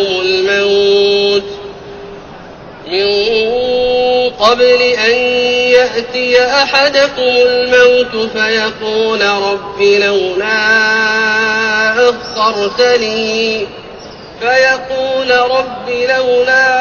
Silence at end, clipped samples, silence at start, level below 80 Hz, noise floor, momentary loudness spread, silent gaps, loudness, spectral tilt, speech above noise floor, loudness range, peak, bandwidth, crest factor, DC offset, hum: 0 s; under 0.1%; 0 s; -46 dBFS; -31 dBFS; 10 LU; none; -11 LUFS; -2.5 dB/octave; 20 dB; 4 LU; 0 dBFS; 7 kHz; 12 dB; under 0.1%; none